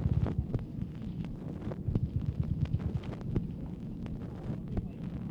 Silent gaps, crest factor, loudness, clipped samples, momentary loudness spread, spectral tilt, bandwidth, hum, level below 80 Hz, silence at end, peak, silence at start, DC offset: none; 18 dB; -37 LUFS; under 0.1%; 7 LU; -10 dB/octave; 6.8 kHz; none; -42 dBFS; 0 s; -18 dBFS; 0 s; under 0.1%